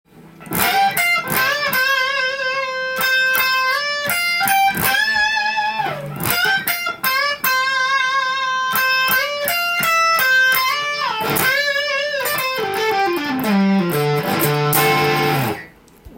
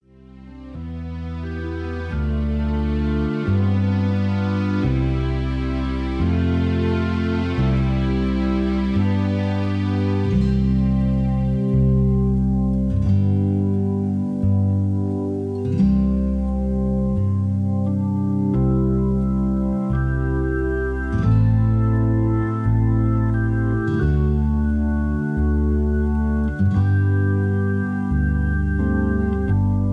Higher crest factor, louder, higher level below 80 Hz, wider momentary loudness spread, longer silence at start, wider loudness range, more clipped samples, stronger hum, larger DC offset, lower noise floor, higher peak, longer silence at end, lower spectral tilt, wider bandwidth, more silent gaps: first, 18 dB vs 12 dB; first, -17 LUFS vs -21 LUFS; second, -54 dBFS vs -26 dBFS; about the same, 6 LU vs 5 LU; second, 0.15 s vs 0.35 s; about the same, 2 LU vs 2 LU; neither; neither; neither; about the same, -43 dBFS vs -43 dBFS; first, 0 dBFS vs -8 dBFS; about the same, 0 s vs 0 s; second, -3 dB/octave vs -9.5 dB/octave; first, 17 kHz vs 6 kHz; neither